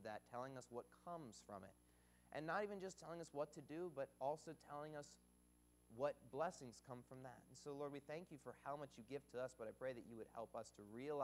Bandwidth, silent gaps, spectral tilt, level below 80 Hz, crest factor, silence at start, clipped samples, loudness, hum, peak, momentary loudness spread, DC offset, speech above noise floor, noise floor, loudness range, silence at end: 15.5 kHz; none; -5.5 dB/octave; -80 dBFS; 22 dB; 0 s; under 0.1%; -53 LUFS; 60 Hz at -75 dBFS; -32 dBFS; 11 LU; under 0.1%; 23 dB; -75 dBFS; 3 LU; 0 s